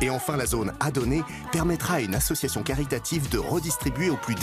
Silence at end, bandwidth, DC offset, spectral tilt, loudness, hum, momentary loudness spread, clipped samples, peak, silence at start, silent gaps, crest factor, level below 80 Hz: 0 s; 15 kHz; under 0.1%; -4.5 dB/octave; -26 LUFS; none; 3 LU; under 0.1%; -10 dBFS; 0 s; none; 16 dB; -38 dBFS